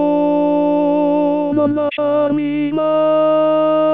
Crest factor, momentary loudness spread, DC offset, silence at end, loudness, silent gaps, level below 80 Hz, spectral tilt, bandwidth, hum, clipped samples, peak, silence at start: 10 dB; 4 LU; 0.4%; 0 s; -15 LUFS; none; -64 dBFS; -9.5 dB/octave; 4 kHz; none; under 0.1%; -4 dBFS; 0 s